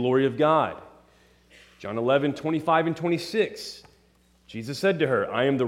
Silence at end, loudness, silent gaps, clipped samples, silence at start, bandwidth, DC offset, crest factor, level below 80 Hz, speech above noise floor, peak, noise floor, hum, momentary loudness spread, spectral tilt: 0 s; -25 LUFS; none; under 0.1%; 0 s; 15.5 kHz; under 0.1%; 18 dB; -64 dBFS; 37 dB; -8 dBFS; -61 dBFS; none; 17 LU; -6 dB/octave